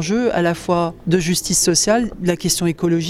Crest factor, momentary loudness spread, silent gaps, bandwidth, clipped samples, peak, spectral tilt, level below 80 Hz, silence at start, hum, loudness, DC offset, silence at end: 14 dB; 5 LU; none; 16 kHz; under 0.1%; -2 dBFS; -4 dB/octave; -42 dBFS; 0 s; none; -17 LUFS; under 0.1%; 0 s